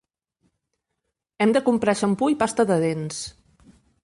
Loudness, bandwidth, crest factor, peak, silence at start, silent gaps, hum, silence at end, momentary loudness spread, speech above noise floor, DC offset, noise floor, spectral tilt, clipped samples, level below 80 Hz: -22 LUFS; 11.5 kHz; 16 dB; -8 dBFS; 1.4 s; none; none; 0.75 s; 11 LU; 59 dB; under 0.1%; -80 dBFS; -5.5 dB/octave; under 0.1%; -60 dBFS